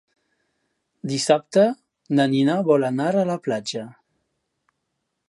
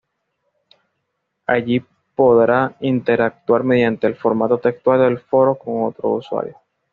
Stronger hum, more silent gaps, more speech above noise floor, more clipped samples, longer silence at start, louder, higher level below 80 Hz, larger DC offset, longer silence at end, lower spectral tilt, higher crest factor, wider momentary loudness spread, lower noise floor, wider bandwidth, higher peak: neither; neither; about the same, 57 dB vs 57 dB; neither; second, 1.05 s vs 1.5 s; second, -21 LUFS vs -17 LUFS; second, -74 dBFS vs -58 dBFS; neither; first, 1.4 s vs 0.4 s; about the same, -5.5 dB/octave vs -5.5 dB/octave; about the same, 20 dB vs 16 dB; first, 14 LU vs 8 LU; about the same, -77 dBFS vs -74 dBFS; first, 11.5 kHz vs 4.9 kHz; about the same, -4 dBFS vs -2 dBFS